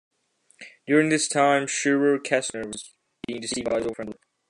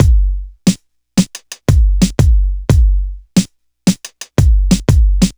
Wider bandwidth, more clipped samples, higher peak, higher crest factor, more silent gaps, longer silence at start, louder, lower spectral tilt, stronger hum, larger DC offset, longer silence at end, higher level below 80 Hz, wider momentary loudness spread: second, 11 kHz vs over 20 kHz; neither; second, -6 dBFS vs 0 dBFS; first, 20 dB vs 12 dB; neither; first, 0.6 s vs 0 s; second, -23 LUFS vs -15 LUFS; second, -3.5 dB/octave vs -6 dB/octave; neither; neither; first, 0.35 s vs 0.05 s; second, -62 dBFS vs -14 dBFS; first, 17 LU vs 9 LU